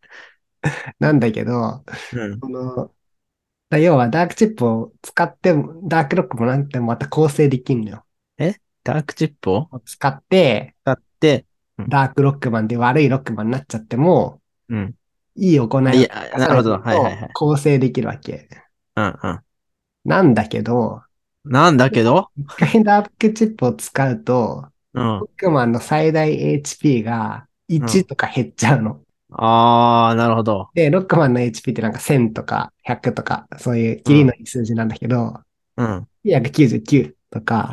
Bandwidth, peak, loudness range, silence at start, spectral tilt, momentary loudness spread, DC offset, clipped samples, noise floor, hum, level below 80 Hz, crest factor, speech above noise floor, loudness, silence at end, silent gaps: 12.5 kHz; 0 dBFS; 5 LU; 0.15 s; -6.5 dB/octave; 13 LU; under 0.1%; under 0.1%; -79 dBFS; none; -50 dBFS; 18 dB; 62 dB; -18 LUFS; 0 s; none